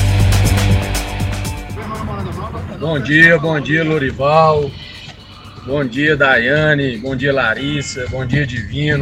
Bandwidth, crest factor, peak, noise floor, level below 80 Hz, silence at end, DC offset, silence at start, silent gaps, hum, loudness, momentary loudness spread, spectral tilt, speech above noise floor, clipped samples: 16 kHz; 16 dB; 0 dBFS; -36 dBFS; -28 dBFS; 0 s; under 0.1%; 0 s; none; none; -15 LUFS; 14 LU; -5.5 dB/octave; 21 dB; under 0.1%